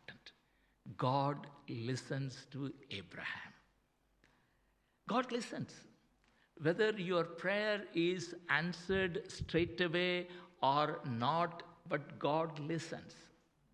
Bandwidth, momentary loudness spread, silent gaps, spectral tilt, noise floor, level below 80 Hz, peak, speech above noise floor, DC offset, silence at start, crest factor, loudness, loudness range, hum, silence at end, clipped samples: 11 kHz; 14 LU; none; -5.5 dB/octave; -77 dBFS; -66 dBFS; -16 dBFS; 39 dB; under 0.1%; 0.1 s; 22 dB; -38 LUFS; 9 LU; none; 0.45 s; under 0.1%